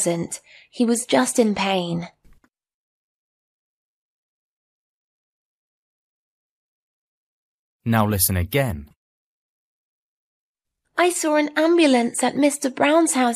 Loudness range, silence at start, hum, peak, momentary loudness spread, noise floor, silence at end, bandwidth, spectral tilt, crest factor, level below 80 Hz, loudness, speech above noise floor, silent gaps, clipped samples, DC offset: 9 LU; 0 s; none; -2 dBFS; 13 LU; -56 dBFS; 0 s; 15.5 kHz; -4.5 dB/octave; 20 dB; -52 dBFS; -20 LUFS; 37 dB; 2.74-7.80 s, 8.96-10.55 s; under 0.1%; under 0.1%